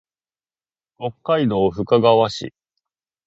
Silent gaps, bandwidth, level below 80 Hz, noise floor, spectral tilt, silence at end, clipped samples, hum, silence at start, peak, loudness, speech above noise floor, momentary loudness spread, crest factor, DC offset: none; 7.8 kHz; -52 dBFS; under -90 dBFS; -6.5 dB/octave; 0.75 s; under 0.1%; none; 1 s; 0 dBFS; -18 LUFS; over 72 dB; 16 LU; 20 dB; under 0.1%